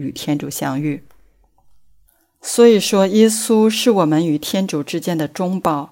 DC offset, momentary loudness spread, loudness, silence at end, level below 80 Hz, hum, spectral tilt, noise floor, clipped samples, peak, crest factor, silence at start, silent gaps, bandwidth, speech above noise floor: under 0.1%; 10 LU; -16 LUFS; 0.05 s; -60 dBFS; none; -5 dB/octave; -55 dBFS; under 0.1%; -2 dBFS; 16 dB; 0 s; none; 16.5 kHz; 39 dB